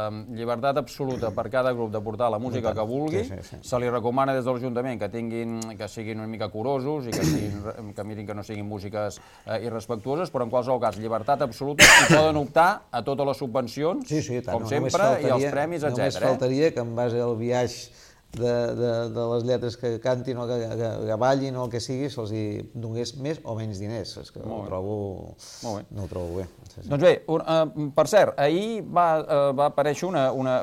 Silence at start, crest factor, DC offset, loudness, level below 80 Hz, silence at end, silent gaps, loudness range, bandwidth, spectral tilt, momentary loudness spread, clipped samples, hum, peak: 0 s; 24 dB; under 0.1%; -24 LUFS; -52 dBFS; 0 s; none; 12 LU; 16.5 kHz; -4.5 dB/octave; 13 LU; under 0.1%; none; -2 dBFS